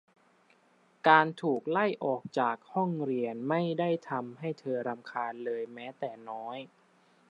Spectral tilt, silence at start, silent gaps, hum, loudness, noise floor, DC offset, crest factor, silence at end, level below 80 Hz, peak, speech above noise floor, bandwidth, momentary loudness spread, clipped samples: -7 dB/octave; 1.05 s; none; none; -31 LUFS; -66 dBFS; under 0.1%; 26 dB; 0.65 s; -86 dBFS; -6 dBFS; 35 dB; 10 kHz; 16 LU; under 0.1%